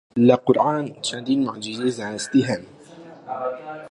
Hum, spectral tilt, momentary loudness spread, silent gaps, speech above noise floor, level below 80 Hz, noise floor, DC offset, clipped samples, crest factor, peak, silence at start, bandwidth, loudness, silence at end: none; -5.5 dB/octave; 13 LU; none; 22 dB; -66 dBFS; -43 dBFS; under 0.1%; under 0.1%; 20 dB; -2 dBFS; 0.15 s; 11 kHz; -22 LUFS; 0.05 s